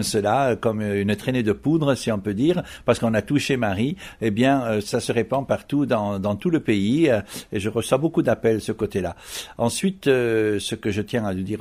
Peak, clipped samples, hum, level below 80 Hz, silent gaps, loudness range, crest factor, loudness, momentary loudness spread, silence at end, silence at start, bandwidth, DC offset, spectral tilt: -4 dBFS; under 0.1%; none; -50 dBFS; none; 1 LU; 18 dB; -22 LUFS; 6 LU; 0 s; 0 s; 16 kHz; under 0.1%; -5.5 dB/octave